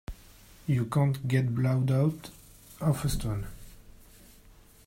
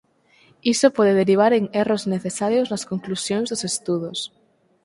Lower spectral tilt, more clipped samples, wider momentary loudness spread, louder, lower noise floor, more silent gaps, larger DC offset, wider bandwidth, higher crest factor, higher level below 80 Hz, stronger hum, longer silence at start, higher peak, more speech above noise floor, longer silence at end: first, -7 dB/octave vs -4.5 dB/octave; neither; first, 18 LU vs 11 LU; second, -29 LUFS vs -21 LUFS; about the same, -55 dBFS vs -57 dBFS; neither; neither; first, 16 kHz vs 11.5 kHz; about the same, 18 dB vs 20 dB; first, -46 dBFS vs -64 dBFS; neither; second, 0.1 s vs 0.65 s; second, -12 dBFS vs -2 dBFS; second, 28 dB vs 36 dB; first, 0.95 s vs 0.6 s